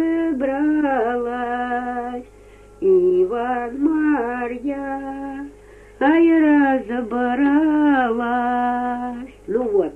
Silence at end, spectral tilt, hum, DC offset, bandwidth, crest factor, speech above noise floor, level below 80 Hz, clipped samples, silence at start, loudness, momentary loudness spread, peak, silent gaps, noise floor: 0 s; -7 dB/octave; 50 Hz at -50 dBFS; under 0.1%; 3.6 kHz; 14 dB; 25 dB; -50 dBFS; under 0.1%; 0 s; -20 LUFS; 13 LU; -6 dBFS; none; -45 dBFS